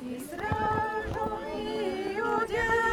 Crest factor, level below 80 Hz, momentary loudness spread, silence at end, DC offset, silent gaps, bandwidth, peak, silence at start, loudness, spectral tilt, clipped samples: 14 dB; -48 dBFS; 7 LU; 0 s; under 0.1%; none; 17.5 kHz; -16 dBFS; 0 s; -30 LUFS; -5.5 dB/octave; under 0.1%